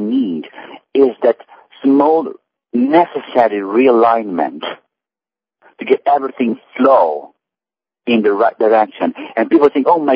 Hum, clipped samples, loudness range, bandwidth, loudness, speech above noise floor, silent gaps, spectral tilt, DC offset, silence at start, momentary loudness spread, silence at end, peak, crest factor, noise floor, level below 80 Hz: none; under 0.1%; 3 LU; 5.2 kHz; -14 LUFS; over 77 dB; none; -8.5 dB/octave; under 0.1%; 0 s; 14 LU; 0 s; 0 dBFS; 14 dB; under -90 dBFS; -68 dBFS